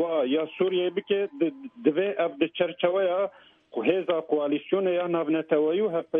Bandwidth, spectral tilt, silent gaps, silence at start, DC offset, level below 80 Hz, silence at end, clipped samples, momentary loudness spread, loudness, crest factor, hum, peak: 3.8 kHz; -9 dB/octave; none; 0 s; under 0.1%; -76 dBFS; 0 s; under 0.1%; 4 LU; -26 LUFS; 16 dB; none; -8 dBFS